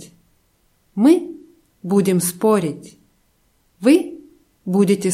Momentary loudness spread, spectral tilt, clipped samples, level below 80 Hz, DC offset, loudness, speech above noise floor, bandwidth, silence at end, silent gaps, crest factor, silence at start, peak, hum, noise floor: 19 LU; -6 dB/octave; under 0.1%; -64 dBFS; under 0.1%; -17 LUFS; 46 dB; 16.5 kHz; 0 s; none; 18 dB; 0 s; -2 dBFS; none; -62 dBFS